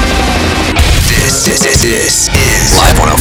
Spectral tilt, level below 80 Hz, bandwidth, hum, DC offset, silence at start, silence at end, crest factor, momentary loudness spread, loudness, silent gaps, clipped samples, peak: -3 dB/octave; -14 dBFS; over 20 kHz; none; under 0.1%; 0 s; 0 s; 8 dB; 4 LU; -8 LUFS; none; 0.7%; 0 dBFS